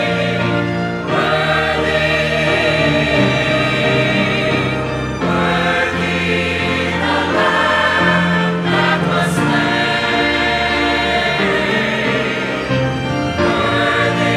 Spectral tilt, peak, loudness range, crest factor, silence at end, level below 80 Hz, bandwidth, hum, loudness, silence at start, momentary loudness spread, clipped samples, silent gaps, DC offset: -5.5 dB/octave; -2 dBFS; 2 LU; 14 dB; 0 s; -38 dBFS; 14 kHz; none; -15 LUFS; 0 s; 4 LU; under 0.1%; none; under 0.1%